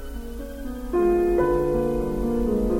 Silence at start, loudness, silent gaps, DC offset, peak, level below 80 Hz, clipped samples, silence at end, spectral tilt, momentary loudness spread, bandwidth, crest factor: 0 s; -23 LUFS; none; under 0.1%; -10 dBFS; -32 dBFS; under 0.1%; 0 s; -8 dB/octave; 15 LU; 16.5 kHz; 14 dB